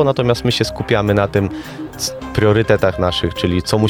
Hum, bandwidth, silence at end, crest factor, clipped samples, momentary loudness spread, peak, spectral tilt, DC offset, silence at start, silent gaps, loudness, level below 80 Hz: none; 18.5 kHz; 0 s; 16 dB; under 0.1%; 9 LU; 0 dBFS; -5.5 dB/octave; under 0.1%; 0 s; none; -17 LUFS; -36 dBFS